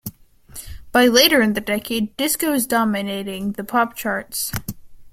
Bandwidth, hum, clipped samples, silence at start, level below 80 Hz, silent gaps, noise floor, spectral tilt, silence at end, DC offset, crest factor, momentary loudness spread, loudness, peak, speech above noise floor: 16.5 kHz; none; under 0.1%; 0.05 s; -46 dBFS; none; -42 dBFS; -3 dB/octave; 0.05 s; under 0.1%; 20 dB; 22 LU; -19 LUFS; 0 dBFS; 23 dB